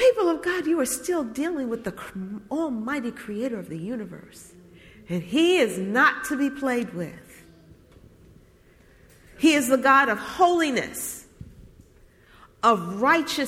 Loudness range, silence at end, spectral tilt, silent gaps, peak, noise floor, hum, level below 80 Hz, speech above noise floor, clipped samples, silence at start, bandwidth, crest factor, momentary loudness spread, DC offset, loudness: 9 LU; 0 s; -4 dB/octave; none; -6 dBFS; -55 dBFS; none; -58 dBFS; 31 dB; under 0.1%; 0 s; 16.5 kHz; 18 dB; 15 LU; under 0.1%; -24 LUFS